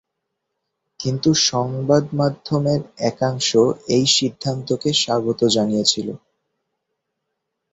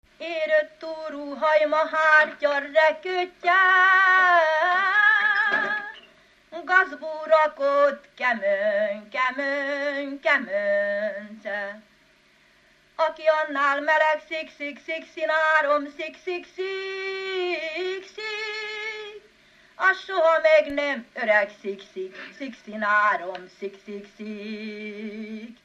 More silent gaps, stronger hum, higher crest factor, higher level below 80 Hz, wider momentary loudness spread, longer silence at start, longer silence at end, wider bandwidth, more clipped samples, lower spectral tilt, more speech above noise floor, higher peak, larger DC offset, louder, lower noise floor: neither; neither; about the same, 18 dB vs 18 dB; first, -56 dBFS vs -70 dBFS; second, 9 LU vs 18 LU; first, 1 s vs 0.2 s; first, 1.55 s vs 0.1 s; about the same, 8.4 kHz vs 8 kHz; neither; about the same, -4.5 dB/octave vs -3.5 dB/octave; first, 59 dB vs 35 dB; first, -2 dBFS vs -6 dBFS; neither; first, -19 LUFS vs -22 LUFS; first, -78 dBFS vs -59 dBFS